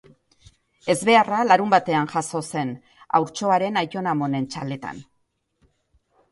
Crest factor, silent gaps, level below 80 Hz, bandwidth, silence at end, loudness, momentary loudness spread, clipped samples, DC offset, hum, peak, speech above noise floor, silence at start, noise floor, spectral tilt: 20 dB; none; -64 dBFS; 12 kHz; 1.3 s; -22 LUFS; 15 LU; under 0.1%; under 0.1%; none; -2 dBFS; 50 dB; 0.85 s; -72 dBFS; -5 dB/octave